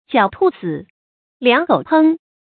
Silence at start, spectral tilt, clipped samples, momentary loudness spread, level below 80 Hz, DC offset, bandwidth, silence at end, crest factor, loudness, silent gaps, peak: 0.1 s; -10.5 dB/octave; under 0.1%; 12 LU; -58 dBFS; under 0.1%; 4.5 kHz; 0.3 s; 16 dB; -16 LUFS; 0.90-1.40 s; 0 dBFS